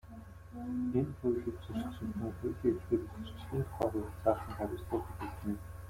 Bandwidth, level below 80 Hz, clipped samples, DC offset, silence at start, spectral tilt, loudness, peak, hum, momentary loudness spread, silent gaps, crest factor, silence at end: 16.5 kHz; -52 dBFS; under 0.1%; under 0.1%; 0.05 s; -8.5 dB/octave; -37 LUFS; -16 dBFS; none; 10 LU; none; 22 dB; 0 s